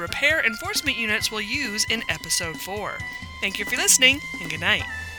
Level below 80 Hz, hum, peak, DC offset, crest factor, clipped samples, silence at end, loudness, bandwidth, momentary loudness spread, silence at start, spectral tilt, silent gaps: -48 dBFS; none; -2 dBFS; under 0.1%; 22 dB; under 0.1%; 0 s; -21 LUFS; over 20 kHz; 14 LU; 0 s; -1 dB/octave; none